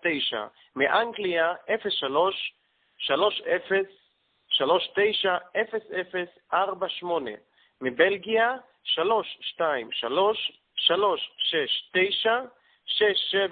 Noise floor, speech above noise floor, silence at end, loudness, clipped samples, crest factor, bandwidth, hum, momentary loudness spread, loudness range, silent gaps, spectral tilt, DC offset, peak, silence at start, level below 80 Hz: -68 dBFS; 42 dB; 0 s; -26 LUFS; under 0.1%; 20 dB; 4.7 kHz; none; 10 LU; 2 LU; none; -7.5 dB/octave; under 0.1%; -6 dBFS; 0 s; -72 dBFS